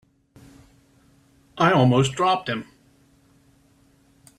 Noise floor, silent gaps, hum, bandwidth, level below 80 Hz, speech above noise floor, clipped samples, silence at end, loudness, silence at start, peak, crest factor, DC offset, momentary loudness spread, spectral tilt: -59 dBFS; none; none; 11.5 kHz; -60 dBFS; 39 dB; under 0.1%; 1.75 s; -20 LUFS; 1.55 s; -4 dBFS; 20 dB; under 0.1%; 12 LU; -6 dB/octave